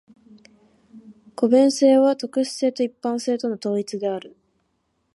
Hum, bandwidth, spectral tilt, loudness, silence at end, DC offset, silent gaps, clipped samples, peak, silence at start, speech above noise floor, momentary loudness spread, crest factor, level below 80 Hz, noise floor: none; 11.5 kHz; -5 dB/octave; -21 LUFS; 0.85 s; under 0.1%; none; under 0.1%; -4 dBFS; 0.95 s; 51 dB; 11 LU; 18 dB; -74 dBFS; -71 dBFS